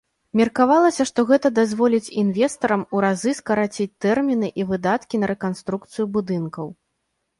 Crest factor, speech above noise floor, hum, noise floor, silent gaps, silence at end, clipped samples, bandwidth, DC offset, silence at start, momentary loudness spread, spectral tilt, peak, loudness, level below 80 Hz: 18 dB; 54 dB; none; -75 dBFS; none; 0.65 s; under 0.1%; 11.5 kHz; under 0.1%; 0.35 s; 9 LU; -6 dB/octave; -4 dBFS; -21 LUFS; -60 dBFS